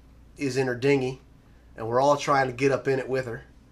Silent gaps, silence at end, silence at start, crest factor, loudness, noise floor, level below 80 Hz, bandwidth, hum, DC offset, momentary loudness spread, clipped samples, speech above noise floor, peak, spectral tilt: none; 0.3 s; 0.4 s; 16 dB; -25 LUFS; -52 dBFS; -54 dBFS; 13 kHz; none; under 0.1%; 14 LU; under 0.1%; 28 dB; -10 dBFS; -5.5 dB/octave